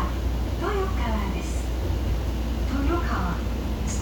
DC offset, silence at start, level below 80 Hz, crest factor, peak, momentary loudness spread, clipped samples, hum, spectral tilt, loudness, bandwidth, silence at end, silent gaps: under 0.1%; 0 s; -28 dBFS; 12 dB; -12 dBFS; 4 LU; under 0.1%; none; -6 dB/octave; -27 LUFS; 19.5 kHz; 0 s; none